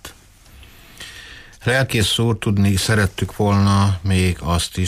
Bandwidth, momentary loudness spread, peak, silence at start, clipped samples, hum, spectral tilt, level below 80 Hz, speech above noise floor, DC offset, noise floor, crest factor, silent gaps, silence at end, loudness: 15.5 kHz; 20 LU; -6 dBFS; 0.05 s; under 0.1%; none; -5 dB/octave; -38 dBFS; 28 dB; under 0.1%; -46 dBFS; 14 dB; none; 0 s; -18 LUFS